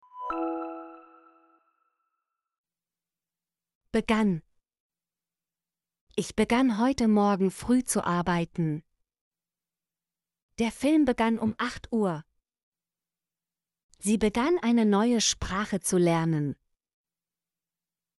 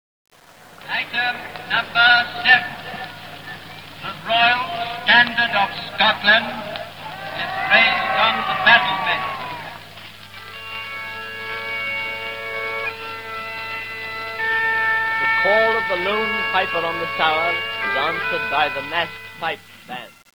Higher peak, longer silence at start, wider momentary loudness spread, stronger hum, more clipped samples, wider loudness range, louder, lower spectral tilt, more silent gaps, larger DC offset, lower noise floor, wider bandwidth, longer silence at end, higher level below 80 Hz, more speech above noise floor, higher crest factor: second, -12 dBFS vs 0 dBFS; second, 0.15 s vs 0.5 s; second, 11 LU vs 19 LU; neither; neither; about the same, 7 LU vs 9 LU; second, -27 LUFS vs -19 LUFS; first, -5 dB/octave vs -3.5 dB/octave; first, 2.58-2.64 s, 3.75-3.81 s, 4.80-4.90 s, 6.01-6.07 s, 9.21-9.31 s, 10.42-10.49 s, 12.63-12.72 s, 13.83-13.89 s vs none; second, under 0.1% vs 0.3%; first, under -90 dBFS vs -45 dBFS; second, 11.5 kHz vs over 20 kHz; first, 1.65 s vs 0.3 s; about the same, -54 dBFS vs -58 dBFS; first, over 65 dB vs 26 dB; about the same, 18 dB vs 22 dB